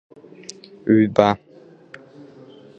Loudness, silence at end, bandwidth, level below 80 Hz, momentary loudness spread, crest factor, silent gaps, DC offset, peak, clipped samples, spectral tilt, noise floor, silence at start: -18 LUFS; 1.4 s; 8.4 kHz; -58 dBFS; 24 LU; 22 dB; none; under 0.1%; 0 dBFS; under 0.1%; -7 dB/octave; -45 dBFS; 0.85 s